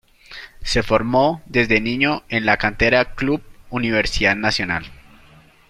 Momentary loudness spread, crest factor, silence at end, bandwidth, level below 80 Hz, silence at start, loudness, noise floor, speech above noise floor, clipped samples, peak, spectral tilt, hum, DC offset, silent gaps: 11 LU; 18 dB; 0.75 s; 14 kHz; -36 dBFS; 0.3 s; -19 LUFS; -49 dBFS; 30 dB; under 0.1%; -2 dBFS; -5 dB/octave; none; under 0.1%; none